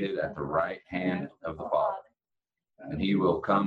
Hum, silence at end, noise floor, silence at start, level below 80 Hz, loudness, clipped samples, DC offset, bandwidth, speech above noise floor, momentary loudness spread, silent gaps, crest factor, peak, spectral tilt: none; 0 s; -89 dBFS; 0 s; -60 dBFS; -30 LUFS; under 0.1%; under 0.1%; 5 kHz; 61 dB; 12 LU; none; 18 dB; -12 dBFS; -9 dB/octave